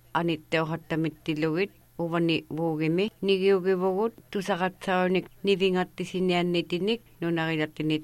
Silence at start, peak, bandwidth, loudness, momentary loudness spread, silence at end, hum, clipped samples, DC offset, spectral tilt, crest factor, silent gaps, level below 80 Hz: 0.15 s; -12 dBFS; 13.5 kHz; -27 LUFS; 6 LU; 0 s; none; under 0.1%; under 0.1%; -6.5 dB/octave; 16 dB; none; -62 dBFS